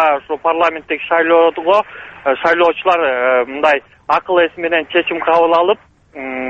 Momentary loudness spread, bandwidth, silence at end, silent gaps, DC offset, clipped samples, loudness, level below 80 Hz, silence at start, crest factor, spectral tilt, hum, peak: 7 LU; 7.2 kHz; 0 s; none; under 0.1%; under 0.1%; -14 LUFS; -54 dBFS; 0 s; 14 dB; -5 dB/octave; none; 0 dBFS